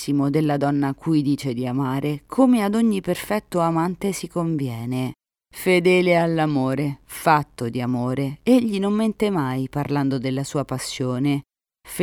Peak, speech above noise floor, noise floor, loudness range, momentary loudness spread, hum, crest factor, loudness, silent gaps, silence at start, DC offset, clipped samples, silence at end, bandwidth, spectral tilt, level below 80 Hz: -4 dBFS; 19 dB; -40 dBFS; 2 LU; 9 LU; none; 18 dB; -22 LUFS; none; 0 s; under 0.1%; under 0.1%; 0 s; 18.5 kHz; -6.5 dB/octave; -54 dBFS